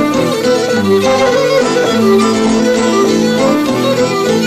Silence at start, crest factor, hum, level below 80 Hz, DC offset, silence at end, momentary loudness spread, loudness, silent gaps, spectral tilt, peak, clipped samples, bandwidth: 0 s; 10 dB; none; -44 dBFS; under 0.1%; 0 s; 2 LU; -11 LUFS; none; -4.5 dB/octave; -2 dBFS; under 0.1%; 15 kHz